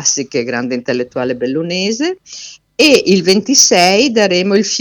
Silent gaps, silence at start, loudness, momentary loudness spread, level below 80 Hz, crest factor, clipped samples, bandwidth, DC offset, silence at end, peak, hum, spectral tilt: none; 0 s; -12 LUFS; 12 LU; -56 dBFS; 14 dB; 0.2%; over 20 kHz; under 0.1%; 0 s; 0 dBFS; none; -2.5 dB/octave